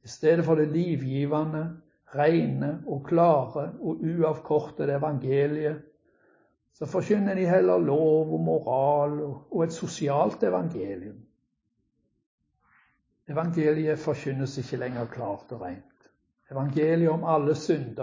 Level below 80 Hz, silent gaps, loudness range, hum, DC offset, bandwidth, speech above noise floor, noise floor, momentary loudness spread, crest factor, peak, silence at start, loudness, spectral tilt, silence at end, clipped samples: -64 dBFS; 12.26-12.38 s; 7 LU; none; under 0.1%; 7.6 kHz; 51 dB; -76 dBFS; 12 LU; 18 dB; -8 dBFS; 0.05 s; -26 LUFS; -8 dB/octave; 0 s; under 0.1%